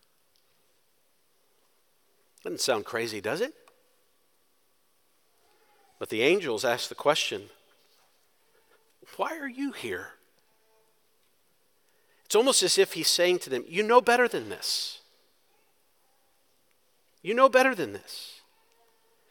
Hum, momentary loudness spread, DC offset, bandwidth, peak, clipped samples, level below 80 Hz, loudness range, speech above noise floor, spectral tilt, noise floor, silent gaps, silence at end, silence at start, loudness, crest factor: none; 18 LU; under 0.1%; 18 kHz; -4 dBFS; under 0.1%; -84 dBFS; 14 LU; 45 dB; -2 dB/octave; -71 dBFS; none; 0.95 s; 2.45 s; -26 LUFS; 26 dB